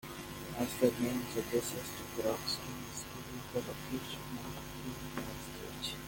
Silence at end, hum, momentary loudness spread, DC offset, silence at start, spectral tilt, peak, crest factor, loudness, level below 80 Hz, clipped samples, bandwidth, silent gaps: 0 s; none; 12 LU; under 0.1%; 0.05 s; -4 dB/octave; -14 dBFS; 24 dB; -38 LUFS; -58 dBFS; under 0.1%; 17 kHz; none